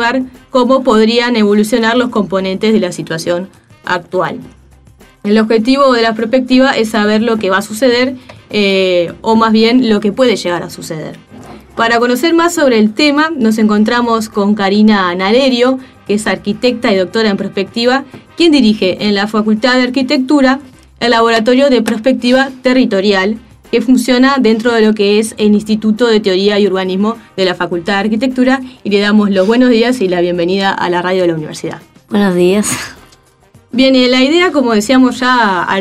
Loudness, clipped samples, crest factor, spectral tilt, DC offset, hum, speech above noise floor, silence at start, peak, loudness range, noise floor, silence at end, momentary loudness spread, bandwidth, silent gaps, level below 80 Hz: -11 LUFS; under 0.1%; 12 dB; -5 dB/octave; 0.2%; none; 35 dB; 0 s; 0 dBFS; 3 LU; -45 dBFS; 0 s; 9 LU; 14 kHz; none; -46 dBFS